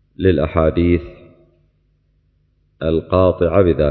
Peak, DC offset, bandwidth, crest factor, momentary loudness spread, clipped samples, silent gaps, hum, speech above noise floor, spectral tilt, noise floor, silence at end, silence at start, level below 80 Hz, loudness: 0 dBFS; under 0.1%; 4.4 kHz; 16 dB; 6 LU; under 0.1%; none; 50 Hz at -55 dBFS; 45 dB; -11.5 dB/octave; -60 dBFS; 0 s; 0.2 s; -30 dBFS; -16 LUFS